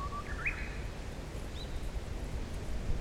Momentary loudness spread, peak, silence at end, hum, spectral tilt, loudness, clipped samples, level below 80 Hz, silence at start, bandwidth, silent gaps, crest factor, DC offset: 7 LU; -20 dBFS; 0 s; none; -5 dB/octave; -40 LUFS; under 0.1%; -40 dBFS; 0 s; 15.5 kHz; none; 16 dB; under 0.1%